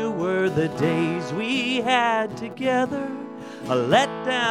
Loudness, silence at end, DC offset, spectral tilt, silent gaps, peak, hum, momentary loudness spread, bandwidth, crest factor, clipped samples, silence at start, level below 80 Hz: -23 LUFS; 0 s; under 0.1%; -5 dB/octave; none; -4 dBFS; none; 10 LU; 13.5 kHz; 18 dB; under 0.1%; 0 s; -60 dBFS